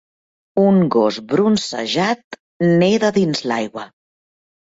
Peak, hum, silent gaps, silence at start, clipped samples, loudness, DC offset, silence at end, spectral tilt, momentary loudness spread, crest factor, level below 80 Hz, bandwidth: -4 dBFS; none; 2.24-2.31 s, 2.40-2.60 s; 0.55 s; under 0.1%; -17 LUFS; under 0.1%; 0.85 s; -6 dB/octave; 11 LU; 14 dB; -58 dBFS; 8 kHz